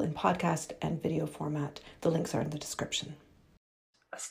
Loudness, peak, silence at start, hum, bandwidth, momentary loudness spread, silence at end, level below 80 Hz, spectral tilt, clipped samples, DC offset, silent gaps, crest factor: -34 LUFS; -12 dBFS; 0 s; none; 15.5 kHz; 12 LU; 0 s; -62 dBFS; -5 dB/octave; under 0.1%; under 0.1%; 3.57-3.93 s; 22 dB